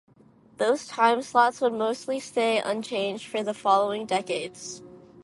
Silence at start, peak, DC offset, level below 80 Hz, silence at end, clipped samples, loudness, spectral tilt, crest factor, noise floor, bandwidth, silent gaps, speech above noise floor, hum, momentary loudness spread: 0.6 s; -6 dBFS; under 0.1%; -72 dBFS; 0.25 s; under 0.1%; -25 LUFS; -3.5 dB/octave; 20 dB; -56 dBFS; 11.5 kHz; none; 31 dB; none; 10 LU